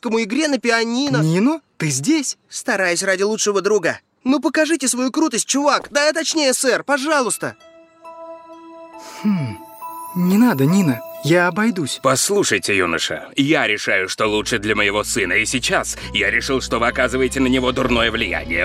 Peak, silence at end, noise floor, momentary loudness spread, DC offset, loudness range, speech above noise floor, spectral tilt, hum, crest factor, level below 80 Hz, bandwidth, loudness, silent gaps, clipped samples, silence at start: -2 dBFS; 0 s; -41 dBFS; 8 LU; under 0.1%; 4 LU; 24 dB; -3.5 dB/octave; none; 16 dB; -42 dBFS; 16.5 kHz; -18 LUFS; none; under 0.1%; 0.05 s